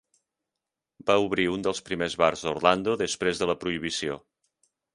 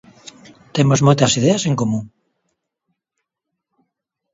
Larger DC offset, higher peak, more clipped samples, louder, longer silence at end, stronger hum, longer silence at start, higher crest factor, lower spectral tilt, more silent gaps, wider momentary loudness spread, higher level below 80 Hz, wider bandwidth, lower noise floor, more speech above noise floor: neither; second, -4 dBFS vs 0 dBFS; neither; second, -26 LUFS vs -16 LUFS; second, 0.75 s vs 2.25 s; neither; first, 1.05 s vs 0.75 s; about the same, 24 dB vs 20 dB; about the same, -4 dB/octave vs -5 dB/octave; neither; second, 7 LU vs 11 LU; about the same, -58 dBFS vs -54 dBFS; first, 11.5 kHz vs 7.8 kHz; first, -87 dBFS vs -79 dBFS; about the same, 61 dB vs 64 dB